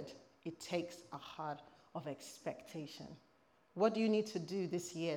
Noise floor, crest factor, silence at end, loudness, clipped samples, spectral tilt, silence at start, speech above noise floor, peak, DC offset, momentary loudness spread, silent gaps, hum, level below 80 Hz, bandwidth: -63 dBFS; 22 dB; 0 s; -41 LUFS; under 0.1%; -5.5 dB/octave; 0 s; 23 dB; -20 dBFS; under 0.1%; 17 LU; none; none; -84 dBFS; 18 kHz